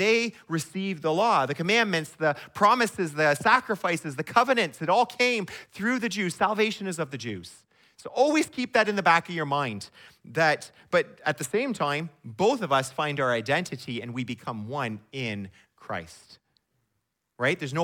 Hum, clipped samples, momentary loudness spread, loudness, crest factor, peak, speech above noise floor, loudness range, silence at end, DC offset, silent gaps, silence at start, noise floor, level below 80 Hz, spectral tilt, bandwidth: none; under 0.1%; 12 LU; -26 LUFS; 20 dB; -6 dBFS; 53 dB; 8 LU; 0 s; under 0.1%; none; 0 s; -79 dBFS; -70 dBFS; -4.5 dB/octave; 18 kHz